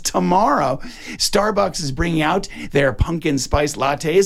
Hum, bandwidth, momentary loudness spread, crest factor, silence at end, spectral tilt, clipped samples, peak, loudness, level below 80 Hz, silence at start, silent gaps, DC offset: none; 16.5 kHz; 6 LU; 14 dB; 0 s; -4.5 dB/octave; under 0.1%; -4 dBFS; -19 LUFS; -32 dBFS; 0 s; none; under 0.1%